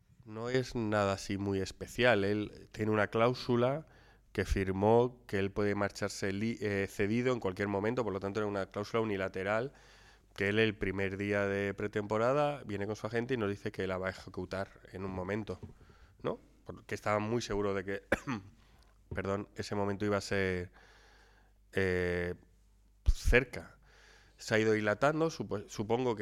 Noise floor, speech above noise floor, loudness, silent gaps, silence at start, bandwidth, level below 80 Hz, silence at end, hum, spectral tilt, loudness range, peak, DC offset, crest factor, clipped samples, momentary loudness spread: -65 dBFS; 31 dB; -34 LUFS; none; 0.25 s; 15.5 kHz; -46 dBFS; 0 s; none; -6 dB/octave; 5 LU; -10 dBFS; under 0.1%; 24 dB; under 0.1%; 12 LU